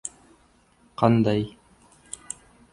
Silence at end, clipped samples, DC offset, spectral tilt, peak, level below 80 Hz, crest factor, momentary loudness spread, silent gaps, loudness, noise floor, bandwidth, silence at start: 1.2 s; under 0.1%; under 0.1%; -6.5 dB/octave; -4 dBFS; -56 dBFS; 24 dB; 20 LU; none; -24 LUFS; -60 dBFS; 11.5 kHz; 0.05 s